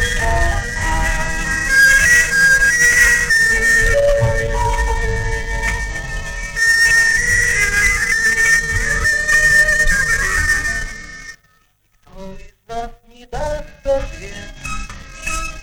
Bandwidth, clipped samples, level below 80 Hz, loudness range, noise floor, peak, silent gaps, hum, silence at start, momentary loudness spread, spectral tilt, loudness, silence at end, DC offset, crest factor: over 20 kHz; under 0.1%; -24 dBFS; 15 LU; -57 dBFS; -2 dBFS; none; none; 0 s; 19 LU; -2 dB/octave; -13 LUFS; 0 s; under 0.1%; 14 dB